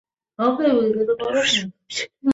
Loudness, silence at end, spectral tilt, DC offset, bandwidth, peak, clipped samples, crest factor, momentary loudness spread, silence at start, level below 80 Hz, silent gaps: -21 LUFS; 0 s; -3.5 dB/octave; under 0.1%; 8 kHz; -6 dBFS; under 0.1%; 14 dB; 10 LU; 0.4 s; -58 dBFS; none